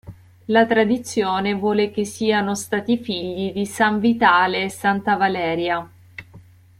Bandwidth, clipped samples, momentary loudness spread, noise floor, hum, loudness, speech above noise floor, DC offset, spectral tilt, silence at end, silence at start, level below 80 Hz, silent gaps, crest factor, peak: 14.5 kHz; under 0.1%; 10 LU; -47 dBFS; none; -20 LUFS; 27 dB; under 0.1%; -4.5 dB/octave; 0.4 s; 0.05 s; -58 dBFS; none; 18 dB; -2 dBFS